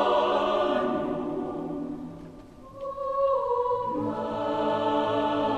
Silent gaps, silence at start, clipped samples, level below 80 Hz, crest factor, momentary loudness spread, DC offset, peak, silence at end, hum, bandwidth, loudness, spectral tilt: none; 0 s; under 0.1%; -56 dBFS; 16 dB; 14 LU; under 0.1%; -12 dBFS; 0 s; none; 9.4 kHz; -27 LUFS; -6.5 dB/octave